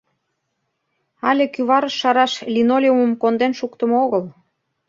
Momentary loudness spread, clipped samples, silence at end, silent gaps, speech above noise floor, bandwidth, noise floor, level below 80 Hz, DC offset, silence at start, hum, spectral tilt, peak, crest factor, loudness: 7 LU; under 0.1%; 0.55 s; none; 56 dB; 7.6 kHz; -73 dBFS; -68 dBFS; under 0.1%; 1.25 s; none; -5 dB/octave; -2 dBFS; 18 dB; -18 LUFS